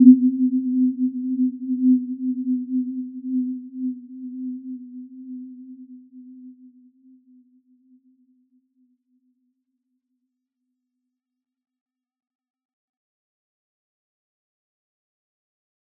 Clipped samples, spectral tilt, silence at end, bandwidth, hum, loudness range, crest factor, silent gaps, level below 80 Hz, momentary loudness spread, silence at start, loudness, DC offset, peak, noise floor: under 0.1%; -15.5 dB/octave; 9.45 s; 0.4 kHz; none; 21 LU; 24 dB; none; -84 dBFS; 23 LU; 0 s; -23 LUFS; under 0.1%; -2 dBFS; -85 dBFS